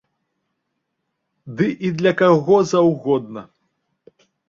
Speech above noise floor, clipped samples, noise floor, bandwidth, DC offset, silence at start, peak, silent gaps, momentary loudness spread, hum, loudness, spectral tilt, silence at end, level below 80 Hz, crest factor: 58 dB; under 0.1%; -75 dBFS; 7.6 kHz; under 0.1%; 1.45 s; -2 dBFS; none; 19 LU; none; -17 LUFS; -6.5 dB/octave; 1.05 s; -60 dBFS; 18 dB